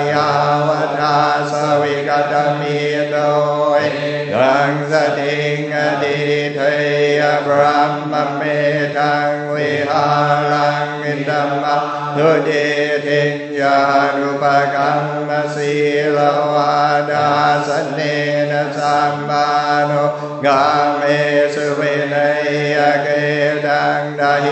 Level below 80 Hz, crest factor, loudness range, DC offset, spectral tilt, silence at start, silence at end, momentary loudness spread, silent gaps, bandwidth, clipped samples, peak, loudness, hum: -66 dBFS; 16 dB; 1 LU; under 0.1%; -5.5 dB/octave; 0 s; 0 s; 4 LU; none; 8.6 kHz; under 0.1%; 0 dBFS; -15 LUFS; none